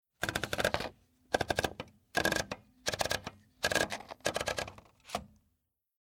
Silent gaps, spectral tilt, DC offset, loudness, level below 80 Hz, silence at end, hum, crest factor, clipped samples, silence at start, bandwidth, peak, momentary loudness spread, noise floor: none; -2.5 dB/octave; under 0.1%; -35 LUFS; -56 dBFS; 0.75 s; none; 28 dB; under 0.1%; 0.2 s; 19.5 kHz; -10 dBFS; 11 LU; -80 dBFS